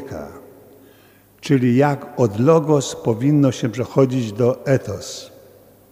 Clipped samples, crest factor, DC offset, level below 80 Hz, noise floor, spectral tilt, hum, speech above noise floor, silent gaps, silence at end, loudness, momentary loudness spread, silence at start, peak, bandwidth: under 0.1%; 18 dB; under 0.1%; -56 dBFS; -51 dBFS; -7 dB/octave; 50 Hz at -50 dBFS; 33 dB; none; 0.65 s; -18 LUFS; 17 LU; 0 s; 0 dBFS; 16 kHz